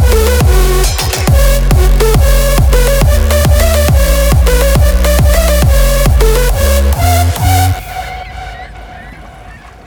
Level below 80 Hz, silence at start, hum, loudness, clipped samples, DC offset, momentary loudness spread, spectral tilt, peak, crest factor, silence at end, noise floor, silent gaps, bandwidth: -10 dBFS; 0 s; none; -10 LUFS; under 0.1%; under 0.1%; 14 LU; -5 dB/octave; 0 dBFS; 8 dB; 0.15 s; -32 dBFS; none; over 20 kHz